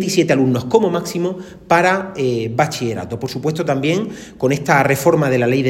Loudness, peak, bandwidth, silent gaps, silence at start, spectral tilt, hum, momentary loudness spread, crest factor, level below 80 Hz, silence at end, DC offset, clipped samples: -17 LUFS; 0 dBFS; 16.5 kHz; none; 0 s; -5.5 dB/octave; none; 9 LU; 16 dB; -52 dBFS; 0 s; under 0.1%; under 0.1%